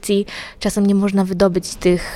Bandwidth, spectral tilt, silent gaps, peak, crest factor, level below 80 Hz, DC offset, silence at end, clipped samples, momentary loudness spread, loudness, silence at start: 15 kHz; -6 dB/octave; none; -2 dBFS; 16 dB; -38 dBFS; under 0.1%; 0 s; under 0.1%; 7 LU; -18 LUFS; 0.05 s